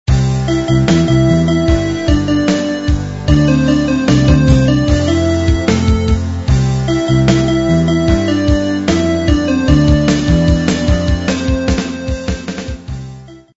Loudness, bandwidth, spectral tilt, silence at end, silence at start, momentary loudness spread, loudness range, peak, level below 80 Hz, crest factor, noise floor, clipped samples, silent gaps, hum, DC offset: -13 LUFS; 8 kHz; -6.5 dB/octave; 0.15 s; 0.05 s; 7 LU; 2 LU; 0 dBFS; -20 dBFS; 12 dB; -33 dBFS; under 0.1%; none; none; 0.9%